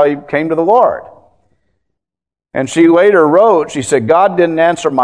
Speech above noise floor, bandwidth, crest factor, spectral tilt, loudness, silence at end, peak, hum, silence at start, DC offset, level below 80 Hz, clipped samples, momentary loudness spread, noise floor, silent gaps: 77 dB; 10.5 kHz; 12 dB; -5.5 dB/octave; -11 LUFS; 0 s; 0 dBFS; none; 0 s; 0.2%; -56 dBFS; 0.2%; 9 LU; -87 dBFS; none